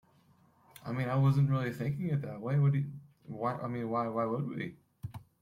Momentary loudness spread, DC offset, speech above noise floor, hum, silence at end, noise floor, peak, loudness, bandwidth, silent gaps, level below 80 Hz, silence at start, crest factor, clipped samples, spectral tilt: 18 LU; under 0.1%; 34 dB; none; 0.2 s; -66 dBFS; -18 dBFS; -33 LUFS; 11.5 kHz; none; -68 dBFS; 0.8 s; 16 dB; under 0.1%; -9 dB/octave